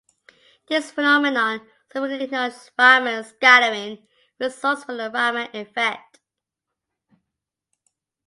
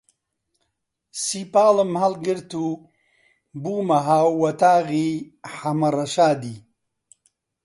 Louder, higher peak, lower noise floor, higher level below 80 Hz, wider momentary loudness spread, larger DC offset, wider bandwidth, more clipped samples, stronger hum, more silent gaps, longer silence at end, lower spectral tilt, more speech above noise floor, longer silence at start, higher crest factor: about the same, -19 LUFS vs -21 LUFS; first, 0 dBFS vs -4 dBFS; first, -85 dBFS vs -77 dBFS; second, -78 dBFS vs -68 dBFS; about the same, 16 LU vs 15 LU; neither; about the same, 11.5 kHz vs 11.5 kHz; neither; neither; neither; first, 2.3 s vs 1.05 s; second, -2 dB/octave vs -5.5 dB/octave; first, 64 dB vs 57 dB; second, 0.7 s vs 1.15 s; about the same, 22 dB vs 18 dB